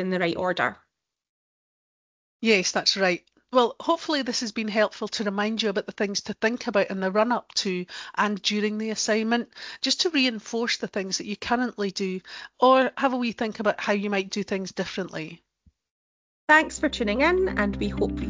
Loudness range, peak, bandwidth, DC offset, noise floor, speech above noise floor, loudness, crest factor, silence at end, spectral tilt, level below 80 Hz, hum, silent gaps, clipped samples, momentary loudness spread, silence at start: 2 LU; -6 dBFS; 7.6 kHz; under 0.1%; under -90 dBFS; over 65 dB; -25 LUFS; 20 dB; 0 s; -3.5 dB/octave; -50 dBFS; none; 1.29-2.40 s, 15.91-16.48 s; under 0.1%; 10 LU; 0 s